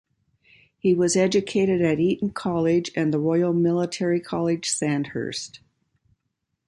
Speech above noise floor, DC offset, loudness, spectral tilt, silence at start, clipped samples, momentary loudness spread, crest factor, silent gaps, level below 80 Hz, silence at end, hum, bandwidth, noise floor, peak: 56 dB; under 0.1%; -23 LUFS; -5.5 dB/octave; 0.85 s; under 0.1%; 7 LU; 16 dB; none; -60 dBFS; 1.1 s; none; 11.5 kHz; -78 dBFS; -8 dBFS